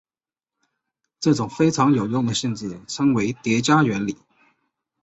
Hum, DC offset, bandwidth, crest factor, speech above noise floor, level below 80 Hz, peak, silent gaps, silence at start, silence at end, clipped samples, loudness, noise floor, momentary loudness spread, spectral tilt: none; under 0.1%; 8.2 kHz; 18 dB; over 70 dB; -58 dBFS; -4 dBFS; none; 1.2 s; 0.9 s; under 0.1%; -21 LUFS; under -90 dBFS; 12 LU; -5.5 dB/octave